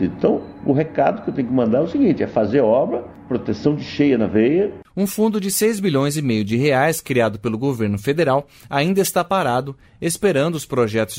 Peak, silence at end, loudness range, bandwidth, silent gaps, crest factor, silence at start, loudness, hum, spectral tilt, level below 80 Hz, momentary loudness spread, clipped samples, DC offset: -2 dBFS; 0 s; 1 LU; 16 kHz; none; 16 dB; 0 s; -19 LUFS; none; -5.5 dB/octave; -52 dBFS; 7 LU; under 0.1%; under 0.1%